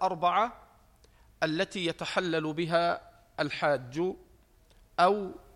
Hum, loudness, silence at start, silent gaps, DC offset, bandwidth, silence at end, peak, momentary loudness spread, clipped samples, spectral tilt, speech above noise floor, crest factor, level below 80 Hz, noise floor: none; -30 LUFS; 0 s; none; under 0.1%; 13 kHz; 0.15 s; -10 dBFS; 9 LU; under 0.1%; -5 dB/octave; 32 dB; 20 dB; -62 dBFS; -61 dBFS